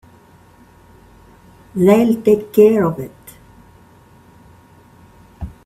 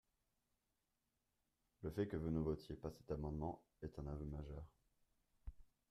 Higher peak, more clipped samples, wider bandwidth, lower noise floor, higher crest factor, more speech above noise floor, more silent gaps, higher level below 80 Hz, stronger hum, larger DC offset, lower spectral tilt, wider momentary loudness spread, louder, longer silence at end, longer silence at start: first, 0 dBFS vs -28 dBFS; neither; first, 15.5 kHz vs 13 kHz; second, -47 dBFS vs -88 dBFS; about the same, 18 dB vs 22 dB; second, 34 dB vs 42 dB; neither; first, -46 dBFS vs -60 dBFS; neither; neither; second, -7.5 dB/octave vs -9 dB/octave; first, 22 LU vs 19 LU; first, -14 LUFS vs -48 LUFS; about the same, 0.15 s vs 0.25 s; about the same, 1.75 s vs 1.8 s